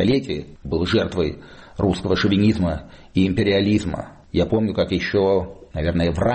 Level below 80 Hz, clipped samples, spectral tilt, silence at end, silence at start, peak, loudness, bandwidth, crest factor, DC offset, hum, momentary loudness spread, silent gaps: -38 dBFS; under 0.1%; -7 dB/octave; 0 s; 0 s; -6 dBFS; -21 LUFS; 8.8 kHz; 14 dB; under 0.1%; none; 12 LU; none